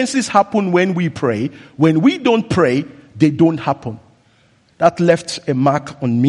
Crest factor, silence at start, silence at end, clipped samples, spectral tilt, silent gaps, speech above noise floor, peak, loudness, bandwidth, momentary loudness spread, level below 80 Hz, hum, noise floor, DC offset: 16 dB; 0 s; 0 s; under 0.1%; -6 dB/octave; none; 39 dB; 0 dBFS; -16 LUFS; 11.5 kHz; 8 LU; -54 dBFS; none; -54 dBFS; under 0.1%